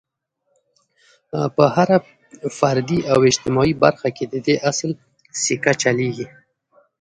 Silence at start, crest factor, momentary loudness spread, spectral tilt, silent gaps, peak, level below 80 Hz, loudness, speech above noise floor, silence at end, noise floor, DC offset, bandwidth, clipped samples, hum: 1.35 s; 20 dB; 14 LU; -4.5 dB/octave; none; 0 dBFS; -52 dBFS; -19 LUFS; 53 dB; 0.75 s; -72 dBFS; under 0.1%; 10.5 kHz; under 0.1%; none